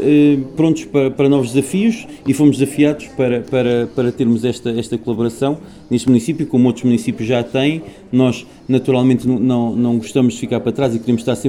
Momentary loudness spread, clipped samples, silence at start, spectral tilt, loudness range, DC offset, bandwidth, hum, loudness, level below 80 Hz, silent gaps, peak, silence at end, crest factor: 7 LU; under 0.1%; 0 s; -7 dB/octave; 2 LU; under 0.1%; 13.5 kHz; none; -16 LUFS; -50 dBFS; none; 0 dBFS; 0 s; 14 dB